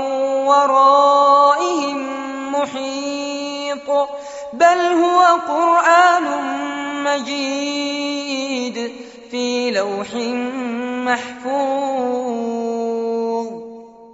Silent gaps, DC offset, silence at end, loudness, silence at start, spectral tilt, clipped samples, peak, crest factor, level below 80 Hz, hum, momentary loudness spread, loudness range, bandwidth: none; under 0.1%; 0 s; -17 LUFS; 0 s; -0.5 dB/octave; under 0.1%; -2 dBFS; 16 dB; -66 dBFS; none; 13 LU; 7 LU; 8 kHz